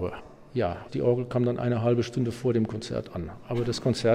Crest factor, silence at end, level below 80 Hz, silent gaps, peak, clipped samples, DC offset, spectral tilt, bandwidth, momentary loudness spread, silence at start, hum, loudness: 16 dB; 0 s; -54 dBFS; none; -10 dBFS; under 0.1%; under 0.1%; -7 dB/octave; 11.5 kHz; 9 LU; 0 s; none; -28 LUFS